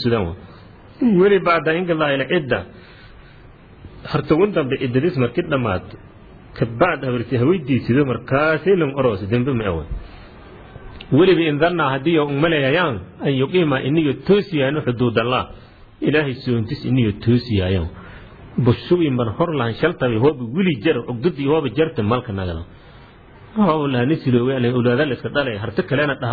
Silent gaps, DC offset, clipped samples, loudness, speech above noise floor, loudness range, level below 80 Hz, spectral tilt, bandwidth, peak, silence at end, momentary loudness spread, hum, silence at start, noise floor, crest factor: none; under 0.1%; under 0.1%; -19 LUFS; 25 dB; 3 LU; -42 dBFS; -10 dB/octave; 4.9 kHz; -2 dBFS; 0 s; 9 LU; none; 0 s; -43 dBFS; 16 dB